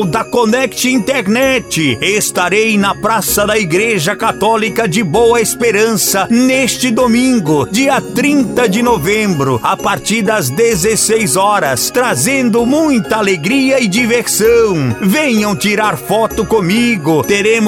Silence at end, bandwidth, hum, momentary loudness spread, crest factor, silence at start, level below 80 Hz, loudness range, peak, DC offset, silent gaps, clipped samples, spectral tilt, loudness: 0 s; 17 kHz; none; 3 LU; 12 dB; 0 s; -40 dBFS; 1 LU; 0 dBFS; under 0.1%; none; under 0.1%; -4 dB/octave; -11 LUFS